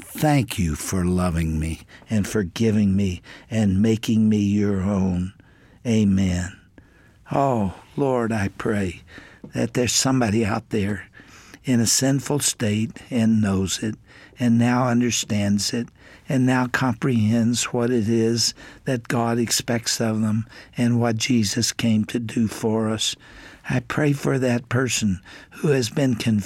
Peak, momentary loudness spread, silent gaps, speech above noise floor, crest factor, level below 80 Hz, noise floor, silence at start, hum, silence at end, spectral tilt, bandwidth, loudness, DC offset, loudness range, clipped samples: -6 dBFS; 9 LU; none; 30 dB; 16 dB; -46 dBFS; -51 dBFS; 0 s; none; 0 s; -5 dB/octave; 16.5 kHz; -22 LUFS; under 0.1%; 2 LU; under 0.1%